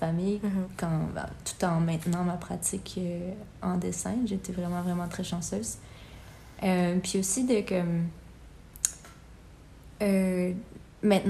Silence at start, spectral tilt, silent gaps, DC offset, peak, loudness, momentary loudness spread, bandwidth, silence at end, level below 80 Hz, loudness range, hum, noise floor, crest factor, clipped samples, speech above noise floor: 0 s; -5.5 dB/octave; none; under 0.1%; -4 dBFS; -30 LUFS; 16 LU; 14.5 kHz; 0 s; -52 dBFS; 3 LU; none; -50 dBFS; 26 dB; under 0.1%; 22 dB